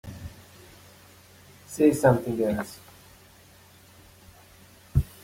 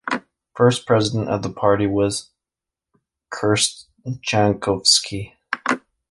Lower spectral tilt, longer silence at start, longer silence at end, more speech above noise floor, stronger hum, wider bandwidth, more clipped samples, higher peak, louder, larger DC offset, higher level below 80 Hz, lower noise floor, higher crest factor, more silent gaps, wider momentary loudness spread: first, -7 dB/octave vs -4 dB/octave; about the same, 0.05 s vs 0.05 s; second, 0.15 s vs 0.3 s; second, 31 dB vs 68 dB; neither; first, 16.5 kHz vs 11.5 kHz; neither; second, -6 dBFS vs -2 dBFS; second, -25 LUFS vs -20 LUFS; neither; first, -44 dBFS vs -50 dBFS; second, -53 dBFS vs -87 dBFS; about the same, 22 dB vs 20 dB; neither; first, 28 LU vs 15 LU